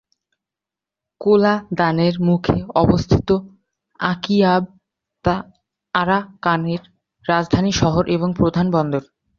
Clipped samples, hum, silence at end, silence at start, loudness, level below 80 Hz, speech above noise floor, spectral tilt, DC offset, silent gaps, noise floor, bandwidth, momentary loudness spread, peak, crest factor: under 0.1%; none; 0.35 s; 1.2 s; -19 LUFS; -40 dBFS; 70 dB; -6.5 dB/octave; under 0.1%; none; -87 dBFS; 7.2 kHz; 8 LU; -2 dBFS; 18 dB